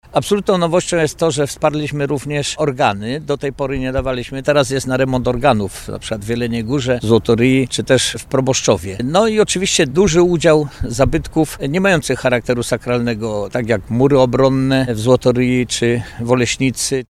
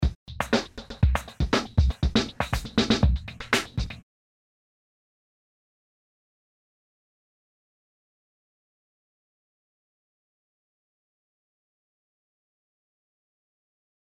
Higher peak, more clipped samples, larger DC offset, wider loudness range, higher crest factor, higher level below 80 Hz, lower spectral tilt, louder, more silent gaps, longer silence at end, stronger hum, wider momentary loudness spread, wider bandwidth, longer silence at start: first, 0 dBFS vs -8 dBFS; neither; neither; second, 4 LU vs 9 LU; second, 16 dB vs 24 dB; about the same, -36 dBFS vs -36 dBFS; about the same, -5 dB/octave vs -5.5 dB/octave; first, -16 LUFS vs -26 LUFS; second, none vs 0.15-0.26 s; second, 0.05 s vs 10.05 s; neither; second, 8 LU vs 11 LU; about the same, 14.5 kHz vs 15 kHz; about the same, 0.1 s vs 0 s